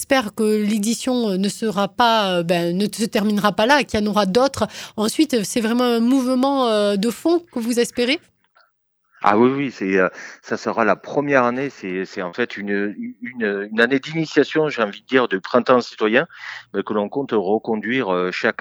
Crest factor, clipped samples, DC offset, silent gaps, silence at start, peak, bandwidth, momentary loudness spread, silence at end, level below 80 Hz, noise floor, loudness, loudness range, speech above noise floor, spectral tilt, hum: 20 dB; under 0.1%; under 0.1%; none; 0 s; 0 dBFS; 17 kHz; 9 LU; 0.1 s; -56 dBFS; -66 dBFS; -20 LUFS; 3 LU; 47 dB; -4.5 dB/octave; none